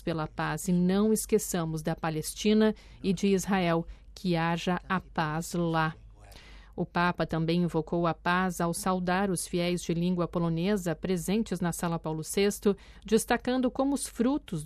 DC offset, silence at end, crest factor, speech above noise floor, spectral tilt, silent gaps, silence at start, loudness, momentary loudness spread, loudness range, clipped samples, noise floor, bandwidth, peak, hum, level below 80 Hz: under 0.1%; 0 s; 16 dB; 21 dB; -5.5 dB/octave; none; 0 s; -29 LUFS; 6 LU; 3 LU; under 0.1%; -50 dBFS; 14.5 kHz; -12 dBFS; none; -50 dBFS